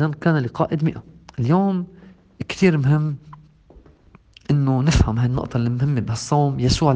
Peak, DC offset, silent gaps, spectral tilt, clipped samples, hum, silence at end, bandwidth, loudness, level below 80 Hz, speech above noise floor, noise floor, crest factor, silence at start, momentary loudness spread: -2 dBFS; under 0.1%; none; -6.5 dB/octave; under 0.1%; none; 0 s; 9.4 kHz; -20 LUFS; -36 dBFS; 32 dB; -50 dBFS; 18 dB; 0 s; 15 LU